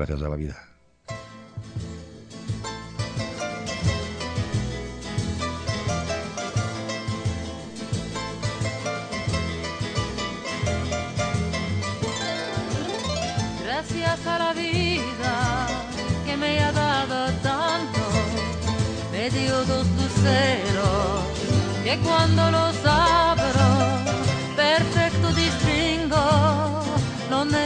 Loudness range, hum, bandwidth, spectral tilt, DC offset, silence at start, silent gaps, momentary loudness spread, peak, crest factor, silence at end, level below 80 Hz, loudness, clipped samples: 9 LU; none; 10.5 kHz; -5 dB/octave; under 0.1%; 0 s; none; 12 LU; -6 dBFS; 18 dB; 0 s; -40 dBFS; -24 LUFS; under 0.1%